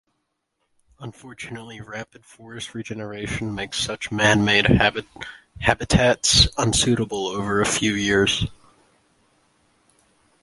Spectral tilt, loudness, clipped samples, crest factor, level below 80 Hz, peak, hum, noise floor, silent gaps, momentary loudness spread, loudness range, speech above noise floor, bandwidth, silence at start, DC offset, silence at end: -3.5 dB/octave; -20 LUFS; under 0.1%; 22 dB; -38 dBFS; 0 dBFS; none; -75 dBFS; none; 21 LU; 14 LU; 53 dB; 11.5 kHz; 1 s; under 0.1%; 1.9 s